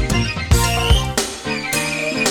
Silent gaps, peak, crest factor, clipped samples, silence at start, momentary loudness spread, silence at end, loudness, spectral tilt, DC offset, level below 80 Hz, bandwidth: none; -2 dBFS; 16 dB; under 0.1%; 0 s; 6 LU; 0 s; -18 LUFS; -3.5 dB/octave; under 0.1%; -24 dBFS; 18.5 kHz